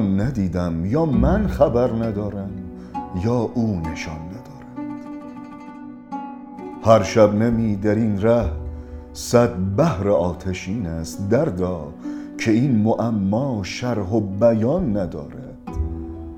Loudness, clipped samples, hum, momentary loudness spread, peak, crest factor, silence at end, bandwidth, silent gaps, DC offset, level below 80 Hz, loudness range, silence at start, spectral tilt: -21 LUFS; under 0.1%; none; 17 LU; 0 dBFS; 20 dB; 0 s; 16 kHz; none; under 0.1%; -36 dBFS; 8 LU; 0 s; -7.5 dB/octave